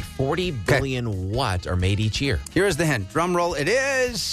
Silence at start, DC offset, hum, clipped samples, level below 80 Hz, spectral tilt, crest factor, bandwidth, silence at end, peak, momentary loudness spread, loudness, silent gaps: 0 s; under 0.1%; none; under 0.1%; -38 dBFS; -5 dB/octave; 14 dB; 14 kHz; 0 s; -8 dBFS; 4 LU; -23 LUFS; none